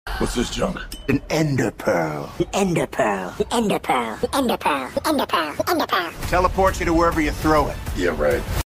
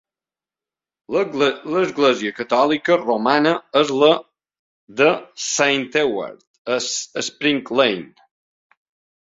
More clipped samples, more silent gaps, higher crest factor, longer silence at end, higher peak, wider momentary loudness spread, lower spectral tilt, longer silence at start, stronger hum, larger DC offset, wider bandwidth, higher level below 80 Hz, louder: neither; second, none vs 4.59-4.87 s, 6.47-6.65 s; about the same, 18 dB vs 20 dB; second, 0.05 s vs 1.15 s; about the same, -4 dBFS vs -2 dBFS; about the same, 6 LU vs 8 LU; first, -5 dB/octave vs -3 dB/octave; second, 0.05 s vs 1.1 s; neither; neither; first, 16 kHz vs 7.8 kHz; first, -34 dBFS vs -64 dBFS; about the same, -21 LUFS vs -19 LUFS